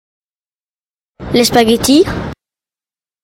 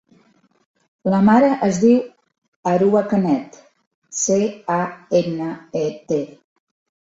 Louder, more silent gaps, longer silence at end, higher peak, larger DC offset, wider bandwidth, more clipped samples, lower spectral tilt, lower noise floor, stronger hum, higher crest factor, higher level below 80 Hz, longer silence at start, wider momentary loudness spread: first, -11 LUFS vs -19 LUFS; second, none vs 2.38-2.42 s, 2.48-2.63 s, 3.87-4.02 s; about the same, 0.95 s vs 0.85 s; about the same, 0 dBFS vs -2 dBFS; neither; first, 16.5 kHz vs 8 kHz; neither; second, -4 dB/octave vs -6 dB/octave; first, under -90 dBFS vs -58 dBFS; neither; about the same, 16 dB vs 16 dB; first, -38 dBFS vs -62 dBFS; first, 1.2 s vs 1.05 s; first, 17 LU vs 13 LU